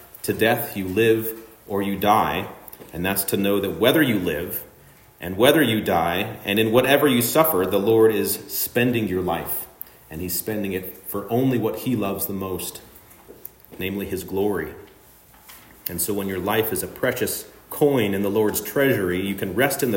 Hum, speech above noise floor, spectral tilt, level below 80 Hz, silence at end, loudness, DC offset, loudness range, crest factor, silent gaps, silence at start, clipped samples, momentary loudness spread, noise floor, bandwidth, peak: none; 29 dB; -4.5 dB/octave; -54 dBFS; 0 s; -22 LUFS; under 0.1%; 8 LU; 22 dB; none; 0 s; under 0.1%; 15 LU; -50 dBFS; 16.5 kHz; -2 dBFS